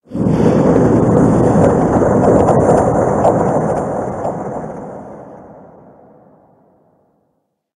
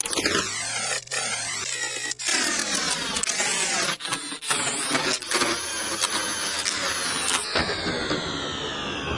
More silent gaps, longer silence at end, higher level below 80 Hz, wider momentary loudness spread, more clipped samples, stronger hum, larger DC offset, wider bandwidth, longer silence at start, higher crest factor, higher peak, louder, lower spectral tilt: neither; first, 2.15 s vs 0 s; first, -36 dBFS vs -54 dBFS; first, 16 LU vs 5 LU; neither; neither; neither; about the same, 10.5 kHz vs 11.5 kHz; about the same, 0.1 s vs 0.05 s; second, 14 dB vs 20 dB; first, 0 dBFS vs -6 dBFS; first, -13 LUFS vs -24 LUFS; first, -8.5 dB/octave vs -1 dB/octave